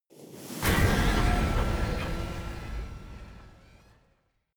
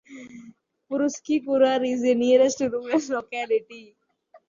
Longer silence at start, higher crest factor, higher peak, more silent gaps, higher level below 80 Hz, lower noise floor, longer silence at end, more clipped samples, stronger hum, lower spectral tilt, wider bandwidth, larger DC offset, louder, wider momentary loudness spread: about the same, 0.15 s vs 0.1 s; about the same, 18 dB vs 16 dB; second, -12 dBFS vs -8 dBFS; neither; first, -34 dBFS vs -70 dBFS; first, -70 dBFS vs -58 dBFS; first, 1.05 s vs 0.1 s; neither; neither; first, -5 dB/octave vs -3.5 dB/octave; first, over 20 kHz vs 7.4 kHz; neither; second, -29 LUFS vs -23 LUFS; first, 22 LU vs 12 LU